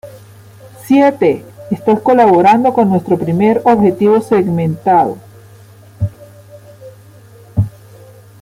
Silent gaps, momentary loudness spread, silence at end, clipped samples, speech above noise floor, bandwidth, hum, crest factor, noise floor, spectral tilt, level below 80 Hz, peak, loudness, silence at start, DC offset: none; 14 LU; 0.75 s; under 0.1%; 29 dB; 16 kHz; none; 12 dB; -39 dBFS; -8.5 dB/octave; -46 dBFS; -2 dBFS; -12 LUFS; 0.05 s; under 0.1%